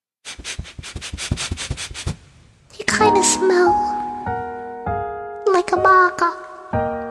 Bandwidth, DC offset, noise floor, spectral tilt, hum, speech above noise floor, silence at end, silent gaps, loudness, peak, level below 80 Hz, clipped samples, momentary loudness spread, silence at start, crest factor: 12.5 kHz; under 0.1%; -49 dBFS; -3.5 dB/octave; none; 34 dB; 0 s; none; -19 LUFS; -2 dBFS; -40 dBFS; under 0.1%; 17 LU; 0.25 s; 18 dB